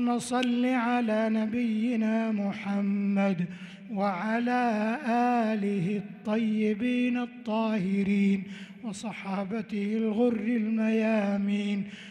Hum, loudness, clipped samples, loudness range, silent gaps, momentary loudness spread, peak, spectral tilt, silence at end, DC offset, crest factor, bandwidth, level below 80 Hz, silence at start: none; -28 LUFS; under 0.1%; 2 LU; none; 8 LU; -14 dBFS; -6.5 dB/octave; 0 s; under 0.1%; 14 dB; 11 kHz; -70 dBFS; 0 s